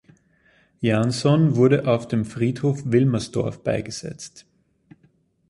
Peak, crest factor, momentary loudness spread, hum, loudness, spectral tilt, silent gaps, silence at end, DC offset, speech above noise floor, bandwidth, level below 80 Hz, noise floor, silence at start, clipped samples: -4 dBFS; 18 dB; 15 LU; none; -21 LUFS; -7 dB/octave; none; 1.1 s; under 0.1%; 41 dB; 11.5 kHz; -54 dBFS; -61 dBFS; 0.8 s; under 0.1%